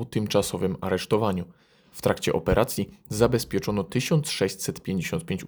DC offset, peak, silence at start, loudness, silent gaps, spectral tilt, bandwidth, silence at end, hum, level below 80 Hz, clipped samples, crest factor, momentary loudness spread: under 0.1%; -4 dBFS; 0 s; -26 LUFS; none; -5 dB/octave; over 20 kHz; 0 s; none; -46 dBFS; under 0.1%; 22 dB; 8 LU